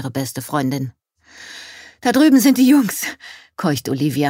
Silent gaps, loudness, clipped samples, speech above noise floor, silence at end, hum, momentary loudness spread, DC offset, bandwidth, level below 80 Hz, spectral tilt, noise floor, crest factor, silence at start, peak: none; -17 LUFS; under 0.1%; 26 dB; 0 s; none; 23 LU; under 0.1%; 16.5 kHz; -62 dBFS; -5 dB/octave; -43 dBFS; 14 dB; 0 s; -4 dBFS